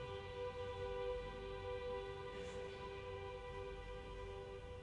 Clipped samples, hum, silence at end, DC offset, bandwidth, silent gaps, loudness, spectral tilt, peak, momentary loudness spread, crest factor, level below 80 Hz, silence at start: under 0.1%; none; 0 s; under 0.1%; 11 kHz; none; -48 LUFS; -5.5 dB/octave; -32 dBFS; 6 LU; 14 dB; -58 dBFS; 0 s